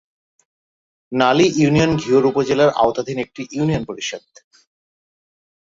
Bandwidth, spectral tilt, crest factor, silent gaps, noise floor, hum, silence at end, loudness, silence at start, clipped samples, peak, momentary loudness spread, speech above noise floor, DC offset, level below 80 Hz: 7.8 kHz; -5.5 dB/octave; 18 dB; none; under -90 dBFS; none; 1.6 s; -17 LUFS; 1.1 s; under 0.1%; -2 dBFS; 12 LU; over 73 dB; under 0.1%; -48 dBFS